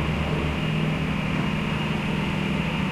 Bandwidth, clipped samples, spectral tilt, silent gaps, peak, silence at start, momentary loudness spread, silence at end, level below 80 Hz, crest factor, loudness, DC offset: 13 kHz; under 0.1%; -6.5 dB/octave; none; -12 dBFS; 0 s; 1 LU; 0 s; -38 dBFS; 12 dB; -25 LUFS; under 0.1%